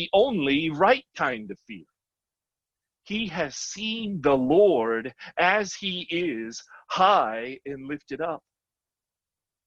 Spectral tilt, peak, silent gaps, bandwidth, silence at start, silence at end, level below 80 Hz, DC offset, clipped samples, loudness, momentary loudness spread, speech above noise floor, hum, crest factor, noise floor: -4 dB/octave; -6 dBFS; none; 8 kHz; 0 s; 1.3 s; -60 dBFS; under 0.1%; under 0.1%; -25 LUFS; 16 LU; 65 dB; none; 20 dB; -90 dBFS